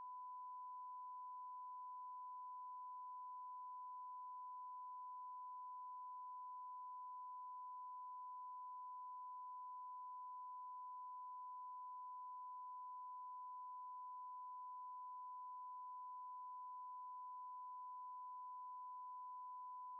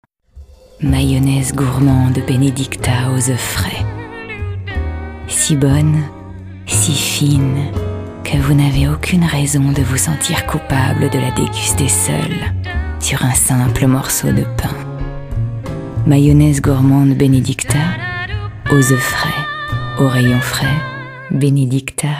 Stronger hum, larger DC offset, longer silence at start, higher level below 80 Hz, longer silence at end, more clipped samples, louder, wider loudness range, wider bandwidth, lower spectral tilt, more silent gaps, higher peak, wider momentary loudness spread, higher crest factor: neither; neither; second, 0 s vs 0.35 s; second, under -90 dBFS vs -28 dBFS; about the same, 0 s vs 0 s; neither; second, -53 LUFS vs -15 LUFS; second, 0 LU vs 3 LU; second, 1.2 kHz vs 16 kHz; second, 16.5 dB/octave vs -5 dB/octave; neither; second, -50 dBFS vs 0 dBFS; second, 0 LU vs 11 LU; second, 4 dB vs 14 dB